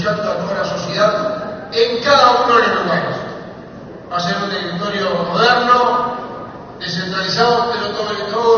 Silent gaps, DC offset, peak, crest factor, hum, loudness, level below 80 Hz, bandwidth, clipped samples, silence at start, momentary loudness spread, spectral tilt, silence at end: none; under 0.1%; 0 dBFS; 16 dB; none; -16 LUFS; -52 dBFS; 6.8 kHz; under 0.1%; 0 s; 18 LU; -2 dB/octave; 0 s